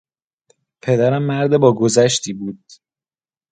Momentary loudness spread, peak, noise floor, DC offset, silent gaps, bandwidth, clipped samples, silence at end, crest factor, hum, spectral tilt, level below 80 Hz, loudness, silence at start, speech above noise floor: 15 LU; 0 dBFS; under -90 dBFS; under 0.1%; none; 9.6 kHz; under 0.1%; 0.95 s; 18 dB; none; -5 dB/octave; -60 dBFS; -16 LUFS; 0.85 s; over 74 dB